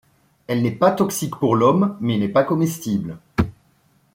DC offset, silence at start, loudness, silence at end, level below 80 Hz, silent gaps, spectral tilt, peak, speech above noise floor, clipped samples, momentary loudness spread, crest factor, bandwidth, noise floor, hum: under 0.1%; 0.5 s; -20 LUFS; 0.65 s; -48 dBFS; none; -6.5 dB/octave; -2 dBFS; 41 dB; under 0.1%; 9 LU; 18 dB; 16.5 kHz; -60 dBFS; none